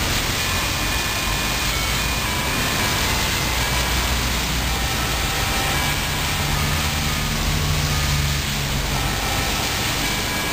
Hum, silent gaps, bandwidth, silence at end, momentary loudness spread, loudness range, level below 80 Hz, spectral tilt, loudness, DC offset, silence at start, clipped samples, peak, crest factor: none; none; 16 kHz; 0 s; 2 LU; 1 LU; -28 dBFS; -3 dB/octave; -20 LUFS; 0.4%; 0 s; under 0.1%; -6 dBFS; 14 dB